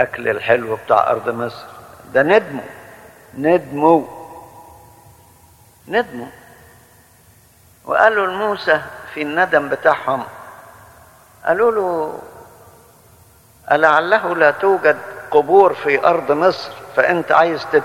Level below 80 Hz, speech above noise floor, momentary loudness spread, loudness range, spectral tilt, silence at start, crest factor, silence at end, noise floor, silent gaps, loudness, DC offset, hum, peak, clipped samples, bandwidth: -58 dBFS; 34 dB; 17 LU; 8 LU; -5.5 dB/octave; 0 s; 18 dB; 0 s; -50 dBFS; none; -16 LUFS; under 0.1%; none; 0 dBFS; under 0.1%; 17 kHz